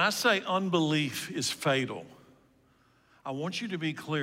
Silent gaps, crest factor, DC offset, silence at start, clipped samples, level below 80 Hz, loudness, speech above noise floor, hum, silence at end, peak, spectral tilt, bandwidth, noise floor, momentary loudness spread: none; 18 dB; under 0.1%; 0 s; under 0.1%; -74 dBFS; -30 LUFS; 35 dB; none; 0 s; -12 dBFS; -4 dB/octave; 16 kHz; -65 dBFS; 11 LU